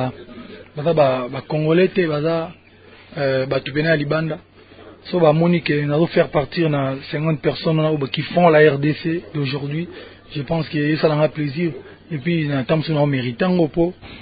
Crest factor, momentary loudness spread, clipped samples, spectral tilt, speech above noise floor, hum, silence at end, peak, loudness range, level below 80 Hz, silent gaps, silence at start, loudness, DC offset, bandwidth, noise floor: 18 dB; 14 LU; under 0.1%; -12 dB/octave; 27 dB; none; 0 s; 0 dBFS; 4 LU; -50 dBFS; none; 0 s; -19 LUFS; under 0.1%; 5 kHz; -46 dBFS